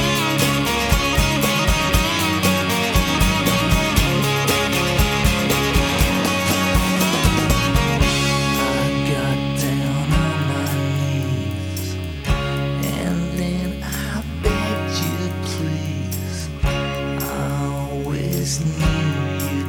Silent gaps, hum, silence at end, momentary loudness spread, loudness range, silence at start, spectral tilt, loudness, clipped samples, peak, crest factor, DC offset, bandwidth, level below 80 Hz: none; none; 0 s; 7 LU; 6 LU; 0 s; -4.5 dB/octave; -19 LUFS; under 0.1%; 0 dBFS; 18 dB; under 0.1%; over 20 kHz; -28 dBFS